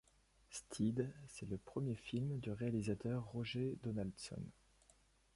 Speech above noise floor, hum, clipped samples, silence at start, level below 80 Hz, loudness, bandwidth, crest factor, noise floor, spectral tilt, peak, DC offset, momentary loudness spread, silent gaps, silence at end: 30 dB; none; under 0.1%; 0.5 s; -66 dBFS; -44 LUFS; 11.5 kHz; 18 dB; -72 dBFS; -6.5 dB/octave; -26 dBFS; under 0.1%; 11 LU; none; 0.85 s